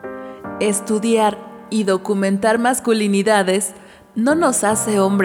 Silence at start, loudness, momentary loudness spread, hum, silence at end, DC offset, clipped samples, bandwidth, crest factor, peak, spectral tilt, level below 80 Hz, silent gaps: 0.05 s; -17 LUFS; 11 LU; none; 0 s; under 0.1%; under 0.1%; 18 kHz; 16 dB; -2 dBFS; -4.5 dB/octave; -58 dBFS; none